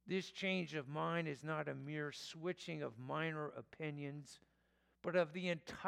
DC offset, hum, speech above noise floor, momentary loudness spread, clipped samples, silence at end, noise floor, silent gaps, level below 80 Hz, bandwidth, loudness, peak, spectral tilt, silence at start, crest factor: under 0.1%; none; 35 dB; 10 LU; under 0.1%; 0 s; -78 dBFS; none; -80 dBFS; 13 kHz; -43 LUFS; -24 dBFS; -5.5 dB/octave; 0.05 s; 18 dB